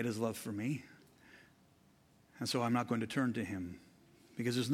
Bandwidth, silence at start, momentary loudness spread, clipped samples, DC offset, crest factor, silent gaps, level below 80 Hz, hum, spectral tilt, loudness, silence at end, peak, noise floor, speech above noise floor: 16 kHz; 0 s; 14 LU; under 0.1%; under 0.1%; 20 dB; none; -76 dBFS; none; -5.5 dB/octave; -38 LUFS; 0 s; -20 dBFS; -67 dBFS; 31 dB